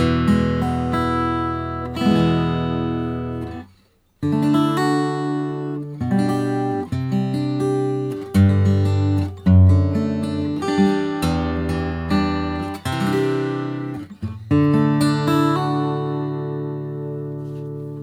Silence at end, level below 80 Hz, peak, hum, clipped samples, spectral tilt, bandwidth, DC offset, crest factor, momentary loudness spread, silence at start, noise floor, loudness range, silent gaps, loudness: 0 s; -40 dBFS; -4 dBFS; none; under 0.1%; -7.5 dB/octave; 14 kHz; under 0.1%; 16 dB; 11 LU; 0 s; -57 dBFS; 4 LU; none; -20 LUFS